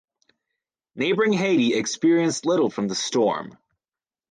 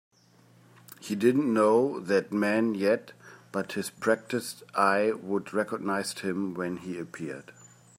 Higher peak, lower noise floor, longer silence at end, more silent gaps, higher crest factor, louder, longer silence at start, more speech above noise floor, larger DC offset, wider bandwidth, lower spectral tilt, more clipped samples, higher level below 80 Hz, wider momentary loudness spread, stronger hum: about the same, -10 dBFS vs -10 dBFS; first, under -90 dBFS vs -60 dBFS; first, 0.8 s vs 0.45 s; neither; second, 14 dB vs 20 dB; first, -22 LUFS vs -28 LUFS; about the same, 0.95 s vs 1 s; first, over 69 dB vs 32 dB; neither; second, 9.8 kHz vs 16 kHz; about the same, -4.5 dB/octave vs -5.5 dB/octave; neither; first, -70 dBFS vs -78 dBFS; second, 6 LU vs 13 LU; neither